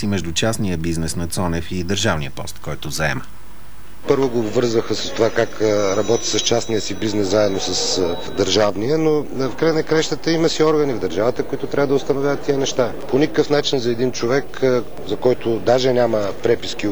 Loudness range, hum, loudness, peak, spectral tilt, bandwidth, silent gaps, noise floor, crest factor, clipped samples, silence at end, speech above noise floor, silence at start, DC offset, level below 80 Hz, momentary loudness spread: 4 LU; none; -19 LUFS; -2 dBFS; -4.5 dB/octave; over 20 kHz; none; -41 dBFS; 18 dB; under 0.1%; 0 s; 22 dB; 0 s; 5%; -42 dBFS; 6 LU